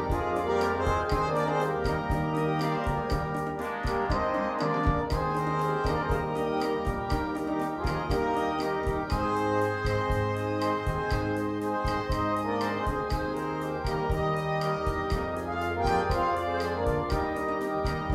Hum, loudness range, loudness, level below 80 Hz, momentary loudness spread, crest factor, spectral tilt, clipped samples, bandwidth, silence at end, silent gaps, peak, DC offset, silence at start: none; 1 LU; -29 LUFS; -38 dBFS; 4 LU; 16 dB; -6.5 dB/octave; under 0.1%; 16 kHz; 0 s; none; -12 dBFS; under 0.1%; 0 s